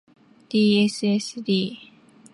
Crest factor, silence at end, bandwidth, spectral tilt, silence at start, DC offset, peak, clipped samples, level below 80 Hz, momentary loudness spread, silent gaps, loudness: 14 dB; 0.5 s; 11.5 kHz; -5.5 dB/octave; 0.5 s; under 0.1%; -10 dBFS; under 0.1%; -70 dBFS; 10 LU; none; -22 LUFS